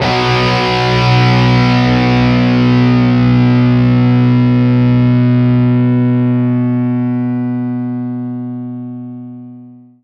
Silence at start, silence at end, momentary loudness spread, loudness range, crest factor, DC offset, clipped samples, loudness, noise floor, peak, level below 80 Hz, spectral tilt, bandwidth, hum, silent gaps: 0 s; 0.3 s; 13 LU; 7 LU; 10 dB; under 0.1%; under 0.1%; -11 LUFS; -36 dBFS; 0 dBFS; -34 dBFS; -8 dB/octave; 6.6 kHz; 60 Hz at -55 dBFS; none